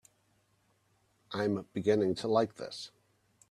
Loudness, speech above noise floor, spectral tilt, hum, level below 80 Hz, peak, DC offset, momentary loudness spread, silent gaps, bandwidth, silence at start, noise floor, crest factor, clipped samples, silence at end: -32 LUFS; 41 dB; -6 dB/octave; none; -72 dBFS; -14 dBFS; under 0.1%; 14 LU; none; 12 kHz; 1.3 s; -73 dBFS; 20 dB; under 0.1%; 0.6 s